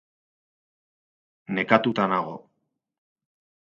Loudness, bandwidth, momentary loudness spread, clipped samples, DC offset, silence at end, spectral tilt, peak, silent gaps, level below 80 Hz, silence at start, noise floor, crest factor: -23 LUFS; 7.2 kHz; 15 LU; under 0.1%; under 0.1%; 1.25 s; -7 dB/octave; 0 dBFS; none; -72 dBFS; 1.5 s; -77 dBFS; 28 dB